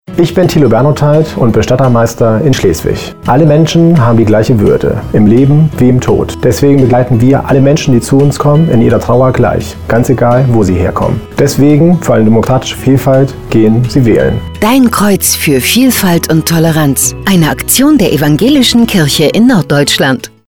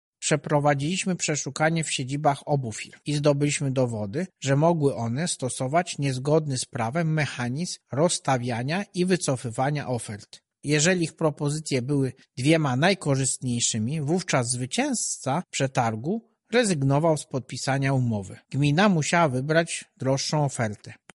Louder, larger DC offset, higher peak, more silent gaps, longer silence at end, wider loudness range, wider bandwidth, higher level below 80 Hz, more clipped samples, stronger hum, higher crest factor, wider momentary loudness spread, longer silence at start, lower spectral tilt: first, -8 LUFS vs -25 LUFS; neither; first, 0 dBFS vs -6 dBFS; neither; about the same, 0.2 s vs 0.2 s; about the same, 1 LU vs 2 LU; first, over 20 kHz vs 11.5 kHz; first, -30 dBFS vs -60 dBFS; neither; neither; second, 8 dB vs 18 dB; second, 5 LU vs 8 LU; second, 0.05 s vs 0.2 s; about the same, -5.5 dB/octave vs -5 dB/octave